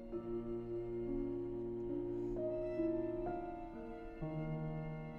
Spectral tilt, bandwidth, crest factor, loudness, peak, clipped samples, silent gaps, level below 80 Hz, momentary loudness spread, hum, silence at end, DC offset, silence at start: -10.5 dB/octave; 4.4 kHz; 14 dB; -42 LUFS; -28 dBFS; under 0.1%; none; -54 dBFS; 8 LU; none; 0 s; under 0.1%; 0 s